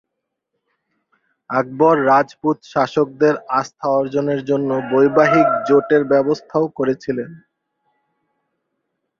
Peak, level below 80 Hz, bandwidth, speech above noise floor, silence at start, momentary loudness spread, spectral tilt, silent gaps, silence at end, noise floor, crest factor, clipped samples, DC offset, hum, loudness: 0 dBFS; -62 dBFS; 7.2 kHz; 62 dB; 1.5 s; 9 LU; -7 dB/octave; none; 1.85 s; -78 dBFS; 18 dB; under 0.1%; under 0.1%; none; -17 LUFS